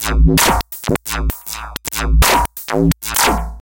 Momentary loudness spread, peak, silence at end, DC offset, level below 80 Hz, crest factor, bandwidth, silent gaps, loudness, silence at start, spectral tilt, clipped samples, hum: 11 LU; -2 dBFS; 0.1 s; under 0.1%; -20 dBFS; 14 dB; 17.5 kHz; none; -16 LUFS; 0 s; -4 dB/octave; under 0.1%; none